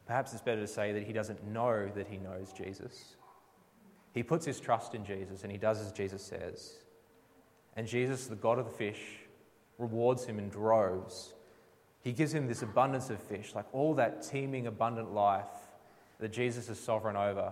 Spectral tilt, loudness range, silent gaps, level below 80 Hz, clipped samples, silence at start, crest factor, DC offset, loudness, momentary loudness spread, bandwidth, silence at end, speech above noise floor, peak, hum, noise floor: -6 dB/octave; 5 LU; none; -74 dBFS; under 0.1%; 0.05 s; 20 dB; under 0.1%; -35 LUFS; 15 LU; 16 kHz; 0 s; 30 dB; -16 dBFS; none; -65 dBFS